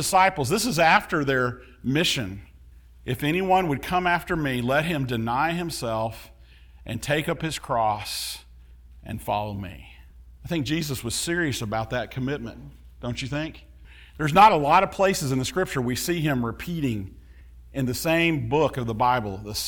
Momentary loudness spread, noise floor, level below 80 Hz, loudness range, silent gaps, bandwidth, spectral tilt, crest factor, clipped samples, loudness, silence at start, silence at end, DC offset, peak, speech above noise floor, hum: 16 LU; -49 dBFS; -46 dBFS; 8 LU; none; over 20 kHz; -4.5 dB/octave; 20 dB; under 0.1%; -24 LUFS; 0 s; 0 s; under 0.1%; -4 dBFS; 25 dB; none